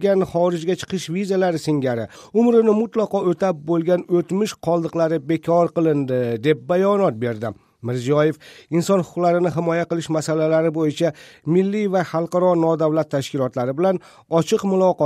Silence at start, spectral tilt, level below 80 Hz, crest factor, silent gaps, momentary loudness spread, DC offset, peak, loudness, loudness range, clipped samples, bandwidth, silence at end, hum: 0 s; -7 dB/octave; -62 dBFS; 14 dB; none; 7 LU; under 0.1%; -4 dBFS; -20 LUFS; 1 LU; under 0.1%; 14.5 kHz; 0 s; none